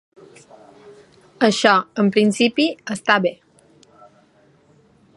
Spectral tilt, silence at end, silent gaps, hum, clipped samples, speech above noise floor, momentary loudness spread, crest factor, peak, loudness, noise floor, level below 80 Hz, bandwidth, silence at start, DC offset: -4.5 dB/octave; 1.8 s; none; none; under 0.1%; 38 dB; 6 LU; 22 dB; 0 dBFS; -18 LUFS; -55 dBFS; -68 dBFS; 11.5 kHz; 0.85 s; under 0.1%